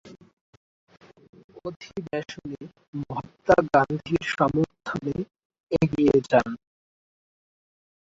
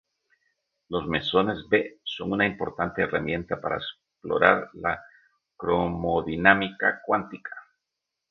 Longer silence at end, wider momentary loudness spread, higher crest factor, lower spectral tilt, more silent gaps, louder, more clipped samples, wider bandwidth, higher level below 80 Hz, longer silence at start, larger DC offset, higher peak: first, 1.65 s vs 0.7 s; first, 19 LU vs 14 LU; about the same, 22 dB vs 26 dB; about the same, -7 dB/octave vs -7.5 dB/octave; first, 0.33-0.87 s, 1.29-1.33 s, 1.44-1.49 s, 1.76-1.80 s, 2.88-2.93 s, 5.45-5.50 s, 5.60-5.67 s vs none; about the same, -24 LUFS vs -25 LUFS; neither; first, 7.8 kHz vs 6.6 kHz; about the same, -54 dBFS vs -52 dBFS; second, 0.05 s vs 0.9 s; neither; second, -4 dBFS vs 0 dBFS